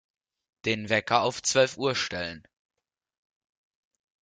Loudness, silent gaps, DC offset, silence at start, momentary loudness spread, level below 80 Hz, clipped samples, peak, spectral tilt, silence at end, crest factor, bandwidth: -26 LUFS; none; under 0.1%; 0.65 s; 11 LU; -66 dBFS; under 0.1%; -6 dBFS; -3 dB/octave; 1.8 s; 24 dB; 9.6 kHz